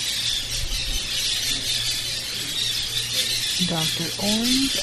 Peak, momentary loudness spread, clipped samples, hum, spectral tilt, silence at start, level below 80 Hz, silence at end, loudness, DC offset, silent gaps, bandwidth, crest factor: -8 dBFS; 5 LU; under 0.1%; none; -1.5 dB/octave; 0 s; -38 dBFS; 0 s; -22 LUFS; under 0.1%; none; 14 kHz; 16 dB